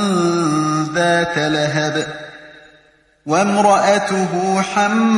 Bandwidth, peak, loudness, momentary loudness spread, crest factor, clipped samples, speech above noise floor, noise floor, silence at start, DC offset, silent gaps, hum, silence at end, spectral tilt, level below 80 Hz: 11.5 kHz; -2 dBFS; -16 LUFS; 9 LU; 14 dB; under 0.1%; 38 dB; -53 dBFS; 0 s; under 0.1%; none; none; 0 s; -5 dB/octave; -56 dBFS